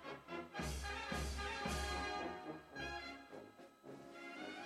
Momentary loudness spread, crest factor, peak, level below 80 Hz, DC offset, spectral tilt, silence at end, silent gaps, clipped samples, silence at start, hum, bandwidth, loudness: 15 LU; 16 dB; -30 dBFS; -54 dBFS; under 0.1%; -4 dB/octave; 0 s; none; under 0.1%; 0 s; none; 14 kHz; -45 LUFS